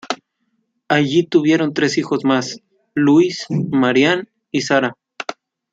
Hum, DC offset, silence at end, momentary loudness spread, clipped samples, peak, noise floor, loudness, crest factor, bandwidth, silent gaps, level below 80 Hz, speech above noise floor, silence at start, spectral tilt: none; under 0.1%; 0.4 s; 15 LU; under 0.1%; -2 dBFS; -69 dBFS; -17 LUFS; 16 dB; 8 kHz; none; -62 dBFS; 53 dB; 0.05 s; -5.5 dB/octave